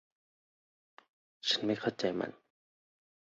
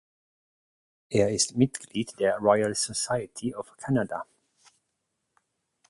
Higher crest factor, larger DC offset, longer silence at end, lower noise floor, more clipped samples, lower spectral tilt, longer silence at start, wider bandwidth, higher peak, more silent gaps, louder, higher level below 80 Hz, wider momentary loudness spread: about the same, 22 dB vs 22 dB; neither; second, 1 s vs 1.65 s; first, under -90 dBFS vs -80 dBFS; neither; second, -2.5 dB/octave vs -4.5 dB/octave; first, 1.45 s vs 1.1 s; second, 7.6 kHz vs 11.5 kHz; second, -18 dBFS vs -6 dBFS; neither; second, -34 LUFS vs -27 LUFS; second, -76 dBFS vs -62 dBFS; second, 8 LU vs 11 LU